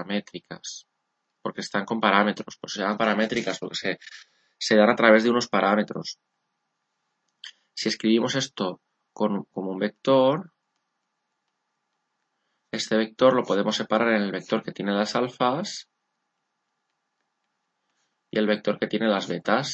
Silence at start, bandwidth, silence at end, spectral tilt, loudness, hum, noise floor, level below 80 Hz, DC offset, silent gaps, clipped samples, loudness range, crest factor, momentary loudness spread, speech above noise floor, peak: 0 s; 8.4 kHz; 0 s; -4.5 dB/octave; -24 LUFS; none; -78 dBFS; -74 dBFS; under 0.1%; none; under 0.1%; 7 LU; 26 dB; 17 LU; 54 dB; 0 dBFS